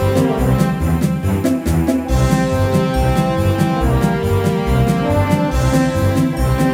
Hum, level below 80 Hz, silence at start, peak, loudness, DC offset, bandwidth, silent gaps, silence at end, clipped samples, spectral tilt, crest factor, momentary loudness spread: none; -24 dBFS; 0 s; -2 dBFS; -16 LUFS; under 0.1%; 16.5 kHz; none; 0 s; under 0.1%; -7 dB/octave; 14 dB; 2 LU